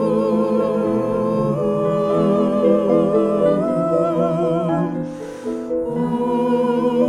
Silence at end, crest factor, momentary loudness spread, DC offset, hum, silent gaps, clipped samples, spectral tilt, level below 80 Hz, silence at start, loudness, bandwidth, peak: 0 s; 14 dB; 7 LU; under 0.1%; none; none; under 0.1%; -8.5 dB/octave; -50 dBFS; 0 s; -19 LUFS; 11 kHz; -4 dBFS